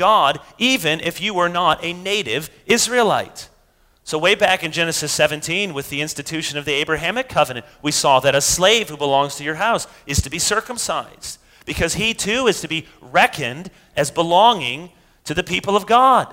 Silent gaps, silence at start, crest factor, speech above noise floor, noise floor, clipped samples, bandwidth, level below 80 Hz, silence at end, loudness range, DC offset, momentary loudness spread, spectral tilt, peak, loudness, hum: none; 0 s; 18 dB; 38 dB; -57 dBFS; under 0.1%; 16 kHz; -44 dBFS; 0 s; 3 LU; under 0.1%; 11 LU; -2.5 dB/octave; 0 dBFS; -18 LUFS; none